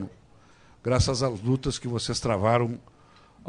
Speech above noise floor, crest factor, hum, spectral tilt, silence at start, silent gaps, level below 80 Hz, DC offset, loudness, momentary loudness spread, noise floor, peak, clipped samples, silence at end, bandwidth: 30 dB; 18 dB; none; -5.5 dB/octave; 0 s; none; -44 dBFS; under 0.1%; -26 LUFS; 11 LU; -55 dBFS; -10 dBFS; under 0.1%; 0 s; 10.5 kHz